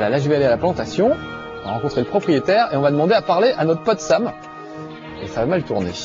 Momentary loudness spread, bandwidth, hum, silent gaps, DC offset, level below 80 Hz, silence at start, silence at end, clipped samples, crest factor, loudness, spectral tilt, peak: 16 LU; 7.8 kHz; none; none; under 0.1%; -48 dBFS; 0 s; 0 s; under 0.1%; 14 dB; -19 LUFS; -6 dB/octave; -4 dBFS